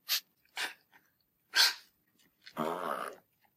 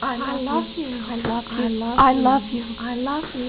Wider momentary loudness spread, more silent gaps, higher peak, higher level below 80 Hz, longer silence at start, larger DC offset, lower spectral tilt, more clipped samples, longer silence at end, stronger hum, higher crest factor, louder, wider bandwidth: first, 20 LU vs 12 LU; neither; second, -12 dBFS vs -6 dBFS; second, under -90 dBFS vs -44 dBFS; about the same, 0.1 s vs 0 s; neither; second, 0 dB/octave vs -9.5 dB/octave; neither; first, 0.4 s vs 0 s; neither; first, 26 dB vs 16 dB; second, -32 LUFS vs -22 LUFS; first, 15.5 kHz vs 4 kHz